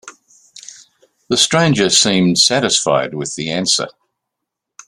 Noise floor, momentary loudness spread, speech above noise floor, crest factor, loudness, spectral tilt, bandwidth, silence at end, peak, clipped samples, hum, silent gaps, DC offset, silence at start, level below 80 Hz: -79 dBFS; 11 LU; 65 dB; 18 dB; -14 LUFS; -3 dB/octave; 13 kHz; 1 s; 0 dBFS; under 0.1%; none; none; under 0.1%; 0.05 s; -54 dBFS